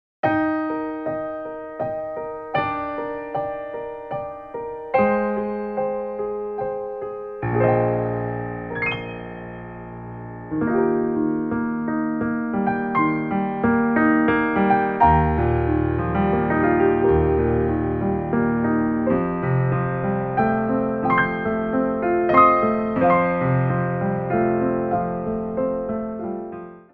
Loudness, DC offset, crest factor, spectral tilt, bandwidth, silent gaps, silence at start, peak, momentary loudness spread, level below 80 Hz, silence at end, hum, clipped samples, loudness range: -22 LUFS; under 0.1%; 18 dB; -11 dB/octave; 4.8 kHz; none; 0.25 s; -2 dBFS; 13 LU; -40 dBFS; 0.1 s; none; under 0.1%; 7 LU